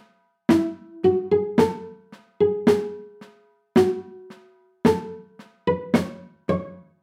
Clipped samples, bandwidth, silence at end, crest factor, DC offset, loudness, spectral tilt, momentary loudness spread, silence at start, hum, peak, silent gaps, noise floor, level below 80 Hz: under 0.1%; 15.5 kHz; 0.2 s; 20 dB; under 0.1%; -23 LUFS; -7 dB/octave; 18 LU; 0.5 s; none; -4 dBFS; none; -55 dBFS; -58 dBFS